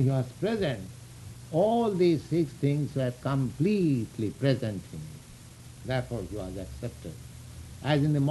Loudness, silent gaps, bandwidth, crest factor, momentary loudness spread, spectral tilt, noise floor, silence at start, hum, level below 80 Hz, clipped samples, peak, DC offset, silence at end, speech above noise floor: -29 LUFS; none; 12 kHz; 18 dB; 20 LU; -7.5 dB/octave; -48 dBFS; 0 s; none; -52 dBFS; under 0.1%; -12 dBFS; under 0.1%; 0 s; 20 dB